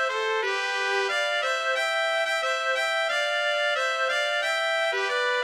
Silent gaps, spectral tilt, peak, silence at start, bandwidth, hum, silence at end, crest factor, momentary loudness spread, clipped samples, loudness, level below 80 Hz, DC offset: none; 2 dB/octave; -12 dBFS; 0 s; 16 kHz; none; 0 s; 14 dB; 1 LU; under 0.1%; -24 LUFS; -78 dBFS; under 0.1%